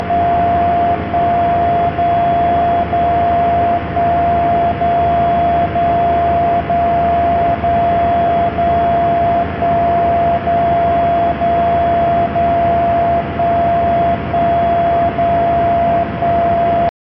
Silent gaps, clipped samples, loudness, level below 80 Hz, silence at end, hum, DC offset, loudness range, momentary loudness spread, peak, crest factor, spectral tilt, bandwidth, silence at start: none; under 0.1%; -14 LUFS; -32 dBFS; 0.2 s; none; under 0.1%; 0 LU; 2 LU; -4 dBFS; 10 dB; -6 dB/octave; 5.4 kHz; 0 s